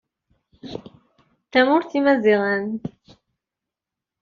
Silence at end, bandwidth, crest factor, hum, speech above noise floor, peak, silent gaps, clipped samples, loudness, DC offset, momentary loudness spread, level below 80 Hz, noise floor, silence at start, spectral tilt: 1.35 s; 7 kHz; 18 dB; none; 68 dB; -6 dBFS; none; under 0.1%; -19 LUFS; under 0.1%; 19 LU; -64 dBFS; -87 dBFS; 0.65 s; -3.5 dB/octave